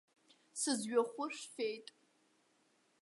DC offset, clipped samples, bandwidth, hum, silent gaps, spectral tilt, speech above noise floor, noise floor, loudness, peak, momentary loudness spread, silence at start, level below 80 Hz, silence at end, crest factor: under 0.1%; under 0.1%; 11.5 kHz; none; none; -2.5 dB/octave; 37 dB; -75 dBFS; -39 LUFS; -20 dBFS; 15 LU; 0.55 s; under -90 dBFS; 1.2 s; 22 dB